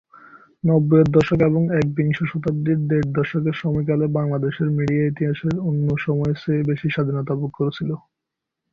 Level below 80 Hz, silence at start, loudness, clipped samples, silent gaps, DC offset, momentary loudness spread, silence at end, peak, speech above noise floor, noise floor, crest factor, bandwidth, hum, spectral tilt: -50 dBFS; 0.35 s; -21 LUFS; under 0.1%; none; under 0.1%; 7 LU; 0.75 s; -2 dBFS; 63 dB; -83 dBFS; 18 dB; 7 kHz; none; -9.5 dB/octave